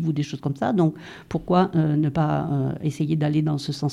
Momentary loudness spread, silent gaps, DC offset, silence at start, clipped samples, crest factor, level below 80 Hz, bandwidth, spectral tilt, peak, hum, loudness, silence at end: 7 LU; none; under 0.1%; 0 s; under 0.1%; 16 dB; -52 dBFS; 11 kHz; -8 dB/octave; -6 dBFS; none; -23 LUFS; 0 s